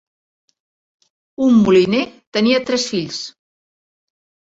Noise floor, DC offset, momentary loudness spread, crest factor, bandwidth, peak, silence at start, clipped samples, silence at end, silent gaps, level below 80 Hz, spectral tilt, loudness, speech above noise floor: under -90 dBFS; under 0.1%; 14 LU; 18 dB; 8 kHz; -2 dBFS; 1.4 s; under 0.1%; 1.1 s; 2.27-2.32 s; -56 dBFS; -5 dB/octave; -16 LUFS; over 75 dB